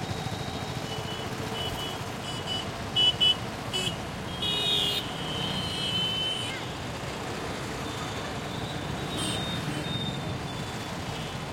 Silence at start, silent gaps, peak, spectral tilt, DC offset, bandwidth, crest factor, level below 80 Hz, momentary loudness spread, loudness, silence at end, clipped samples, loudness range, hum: 0 s; none; -12 dBFS; -3.5 dB/octave; under 0.1%; 16.5 kHz; 18 dB; -50 dBFS; 11 LU; -29 LUFS; 0 s; under 0.1%; 6 LU; none